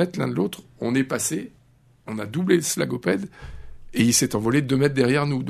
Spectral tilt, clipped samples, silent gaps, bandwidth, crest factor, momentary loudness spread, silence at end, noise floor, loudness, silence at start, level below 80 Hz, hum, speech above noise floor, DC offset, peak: -4.5 dB/octave; under 0.1%; none; 13.5 kHz; 18 dB; 14 LU; 0 s; -56 dBFS; -23 LUFS; 0 s; -50 dBFS; none; 34 dB; under 0.1%; -4 dBFS